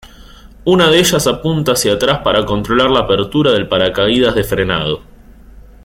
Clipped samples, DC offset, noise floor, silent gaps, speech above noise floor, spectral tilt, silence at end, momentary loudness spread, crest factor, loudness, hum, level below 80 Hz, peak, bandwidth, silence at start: under 0.1%; under 0.1%; -38 dBFS; none; 25 dB; -4.5 dB/octave; 0.25 s; 6 LU; 14 dB; -13 LUFS; none; -36 dBFS; 0 dBFS; 16.5 kHz; 0.05 s